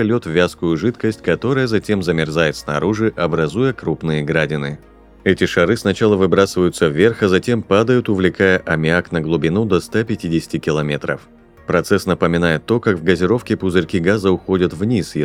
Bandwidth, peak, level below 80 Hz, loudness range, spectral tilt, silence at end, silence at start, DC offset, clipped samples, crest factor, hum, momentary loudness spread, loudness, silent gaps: 16 kHz; 0 dBFS; -44 dBFS; 4 LU; -6.5 dB/octave; 0 s; 0 s; under 0.1%; under 0.1%; 16 dB; none; 6 LU; -17 LUFS; none